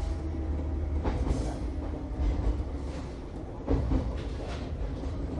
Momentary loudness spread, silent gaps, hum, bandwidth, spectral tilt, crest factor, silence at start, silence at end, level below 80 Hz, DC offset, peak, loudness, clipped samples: 7 LU; none; none; 10.5 kHz; -8 dB/octave; 16 dB; 0 s; 0 s; -32 dBFS; under 0.1%; -16 dBFS; -34 LUFS; under 0.1%